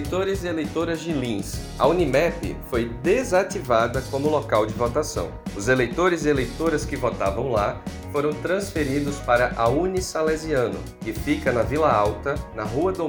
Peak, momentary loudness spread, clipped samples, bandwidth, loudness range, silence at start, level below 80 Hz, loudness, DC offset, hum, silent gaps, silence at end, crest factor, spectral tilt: -4 dBFS; 8 LU; under 0.1%; over 20 kHz; 1 LU; 0 s; -38 dBFS; -23 LUFS; under 0.1%; none; none; 0 s; 18 dB; -5.5 dB/octave